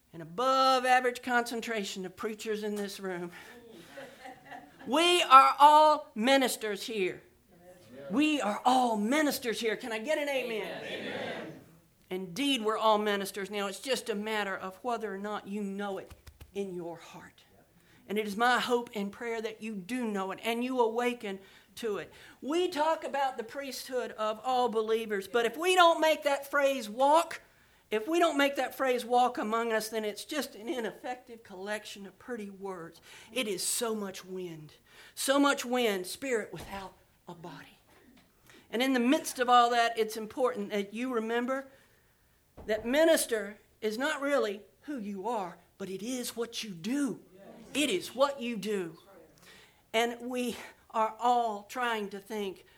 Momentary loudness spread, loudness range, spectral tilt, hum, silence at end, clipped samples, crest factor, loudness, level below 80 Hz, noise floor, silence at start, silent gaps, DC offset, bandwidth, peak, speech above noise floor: 18 LU; 11 LU; -3 dB/octave; none; 0.2 s; under 0.1%; 26 dB; -30 LUFS; -70 dBFS; -67 dBFS; 0.15 s; none; under 0.1%; over 20 kHz; -6 dBFS; 37 dB